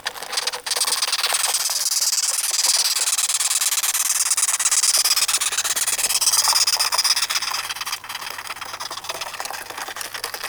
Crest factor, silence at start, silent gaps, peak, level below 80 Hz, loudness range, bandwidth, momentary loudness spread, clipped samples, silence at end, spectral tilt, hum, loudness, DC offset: 18 dB; 0.05 s; none; -4 dBFS; -64 dBFS; 6 LU; over 20 kHz; 14 LU; under 0.1%; 0 s; 3.5 dB/octave; none; -18 LUFS; under 0.1%